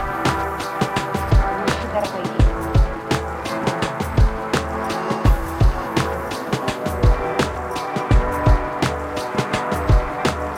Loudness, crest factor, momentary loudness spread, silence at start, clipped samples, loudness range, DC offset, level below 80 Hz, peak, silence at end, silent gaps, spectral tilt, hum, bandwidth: -21 LUFS; 16 dB; 5 LU; 0 s; under 0.1%; 1 LU; under 0.1%; -24 dBFS; -4 dBFS; 0 s; none; -6 dB/octave; none; 16 kHz